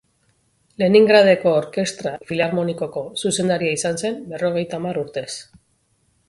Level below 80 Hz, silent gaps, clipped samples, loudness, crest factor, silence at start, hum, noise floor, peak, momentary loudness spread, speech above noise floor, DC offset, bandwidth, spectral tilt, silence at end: -60 dBFS; none; under 0.1%; -19 LUFS; 18 dB; 0.8 s; none; -64 dBFS; -2 dBFS; 14 LU; 45 dB; under 0.1%; 11.5 kHz; -4.5 dB/octave; 0.85 s